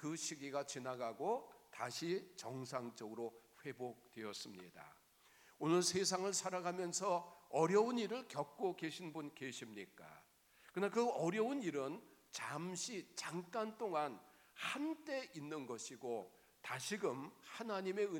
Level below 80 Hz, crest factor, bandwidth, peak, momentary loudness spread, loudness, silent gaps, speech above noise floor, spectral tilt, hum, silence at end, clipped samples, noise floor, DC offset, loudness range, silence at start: -88 dBFS; 22 dB; 19 kHz; -22 dBFS; 15 LU; -42 LUFS; none; 27 dB; -3.5 dB/octave; none; 0 s; under 0.1%; -69 dBFS; under 0.1%; 8 LU; 0 s